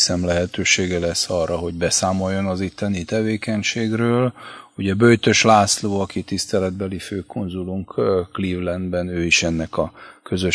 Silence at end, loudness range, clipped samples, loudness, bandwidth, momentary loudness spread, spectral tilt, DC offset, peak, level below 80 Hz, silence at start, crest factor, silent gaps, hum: 0 s; 4 LU; under 0.1%; -20 LUFS; 11 kHz; 12 LU; -4 dB/octave; under 0.1%; 0 dBFS; -46 dBFS; 0 s; 20 dB; none; none